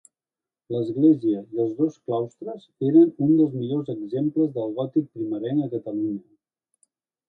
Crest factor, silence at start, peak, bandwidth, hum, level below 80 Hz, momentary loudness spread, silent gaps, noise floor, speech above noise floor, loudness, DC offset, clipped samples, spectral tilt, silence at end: 18 dB; 0.7 s; -6 dBFS; 4.2 kHz; none; -72 dBFS; 12 LU; none; under -90 dBFS; over 67 dB; -23 LUFS; under 0.1%; under 0.1%; -10 dB/octave; 1.1 s